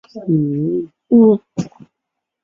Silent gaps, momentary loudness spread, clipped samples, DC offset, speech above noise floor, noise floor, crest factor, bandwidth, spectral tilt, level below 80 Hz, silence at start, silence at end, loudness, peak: none; 16 LU; under 0.1%; under 0.1%; 64 dB; -79 dBFS; 16 dB; 7.4 kHz; -10 dB/octave; -60 dBFS; 0.15 s; 0.75 s; -16 LUFS; -2 dBFS